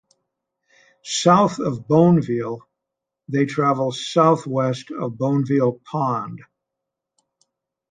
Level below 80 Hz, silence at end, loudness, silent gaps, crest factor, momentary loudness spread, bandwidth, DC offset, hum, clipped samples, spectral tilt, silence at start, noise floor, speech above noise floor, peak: -62 dBFS; 1.55 s; -20 LUFS; none; 20 dB; 13 LU; 9.4 kHz; under 0.1%; none; under 0.1%; -6 dB/octave; 1.05 s; -83 dBFS; 64 dB; -2 dBFS